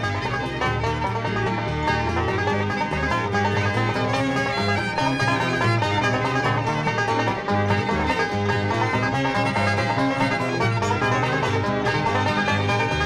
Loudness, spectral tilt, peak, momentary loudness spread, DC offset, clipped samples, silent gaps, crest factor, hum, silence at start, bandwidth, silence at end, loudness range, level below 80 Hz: -22 LUFS; -5.5 dB/octave; -10 dBFS; 3 LU; under 0.1%; under 0.1%; none; 12 dB; none; 0 s; 12 kHz; 0 s; 1 LU; -42 dBFS